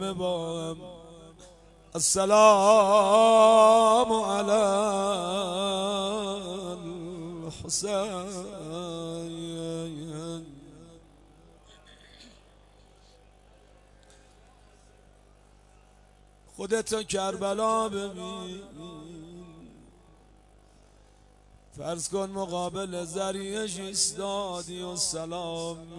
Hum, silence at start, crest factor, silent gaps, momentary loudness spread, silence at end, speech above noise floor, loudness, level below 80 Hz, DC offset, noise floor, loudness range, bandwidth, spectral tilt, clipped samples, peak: 50 Hz at -55 dBFS; 0 s; 22 dB; none; 21 LU; 0 s; 32 dB; -26 LUFS; -58 dBFS; under 0.1%; -57 dBFS; 20 LU; 11.5 kHz; -3.5 dB/octave; under 0.1%; -6 dBFS